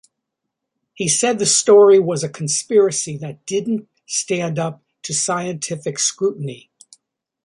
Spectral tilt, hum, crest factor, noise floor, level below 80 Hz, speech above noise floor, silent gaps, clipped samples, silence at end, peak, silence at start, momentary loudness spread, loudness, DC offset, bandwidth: -3.5 dB/octave; none; 16 dB; -79 dBFS; -64 dBFS; 62 dB; none; under 0.1%; 0.9 s; -2 dBFS; 1 s; 15 LU; -17 LUFS; under 0.1%; 11.5 kHz